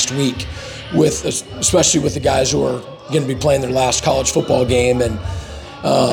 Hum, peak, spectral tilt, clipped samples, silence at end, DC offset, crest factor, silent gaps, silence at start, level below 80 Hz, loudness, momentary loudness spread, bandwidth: none; -4 dBFS; -4 dB/octave; under 0.1%; 0 s; under 0.1%; 14 dB; none; 0 s; -36 dBFS; -16 LUFS; 13 LU; 19.5 kHz